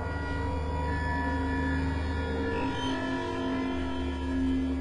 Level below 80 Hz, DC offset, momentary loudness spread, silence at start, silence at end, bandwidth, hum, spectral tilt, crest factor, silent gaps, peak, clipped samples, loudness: -38 dBFS; under 0.1%; 3 LU; 0 s; 0 s; 10 kHz; none; -7 dB/octave; 12 dB; none; -18 dBFS; under 0.1%; -31 LUFS